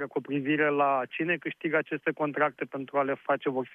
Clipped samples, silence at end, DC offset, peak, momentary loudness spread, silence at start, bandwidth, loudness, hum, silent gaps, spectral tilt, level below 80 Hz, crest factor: under 0.1%; 0 s; under 0.1%; -12 dBFS; 6 LU; 0 s; 3.8 kHz; -29 LUFS; none; none; -8.5 dB/octave; -82 dBFS; 16 dB